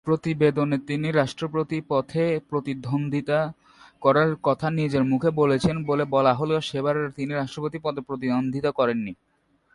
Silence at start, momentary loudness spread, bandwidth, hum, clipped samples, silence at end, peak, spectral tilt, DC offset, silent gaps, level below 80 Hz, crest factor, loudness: 0.05 s; 8 LU; 11.5 kHz; none; under 0.1%; 0.6 s; -6 dBFS; -7.5 dB/octave; under 0.1%; none; -56 dBFS; 18 dB; -24 LUFS